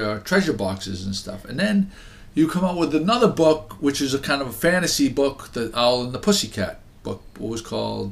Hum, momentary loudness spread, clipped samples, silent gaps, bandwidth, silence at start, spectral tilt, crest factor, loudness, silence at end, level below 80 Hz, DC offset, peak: none; 12 LU; under 0.1%; none; 15.5 kHz; 0 s; -4.5 dB/octave; 18 dB; -22 LUFS; 0 s; -46 dBFS; under 0.1%; -4 dBFS